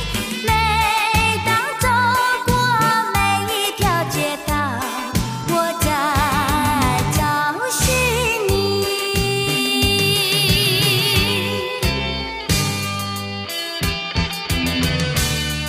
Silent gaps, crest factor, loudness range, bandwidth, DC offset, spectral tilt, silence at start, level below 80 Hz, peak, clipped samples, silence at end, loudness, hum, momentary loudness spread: none; 16 dB; 4 LU; 15.5 kHz; under 0.1%; -3.5 dB/octave; 0 s; -32 dBFS; -2 dBFS; under 0.1%; 0 s; -18 LUFS; none; 7 LU